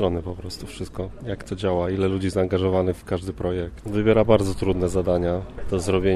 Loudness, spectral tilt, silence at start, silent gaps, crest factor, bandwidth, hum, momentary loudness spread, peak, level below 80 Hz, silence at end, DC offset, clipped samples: -24 LUFS; -7 dB/octave; 0 s; none; 20 dB; 13 kHz; none; 13 LU; -4 dBFS; -40 dBFS; 0 s; under 0.1%; under 0.1%